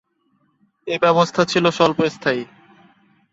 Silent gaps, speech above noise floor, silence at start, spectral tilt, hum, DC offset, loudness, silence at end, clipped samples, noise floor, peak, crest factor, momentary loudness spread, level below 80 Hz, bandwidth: none; 47 dB; 0.85 s; -5 dB/octave; none; under 0.1%; -18 LUFS; 0.9 s; under 0.1%; -65 dBFS; -2 dBFS; 20 dB; 12 LU; -60 dBFS; 8 kHz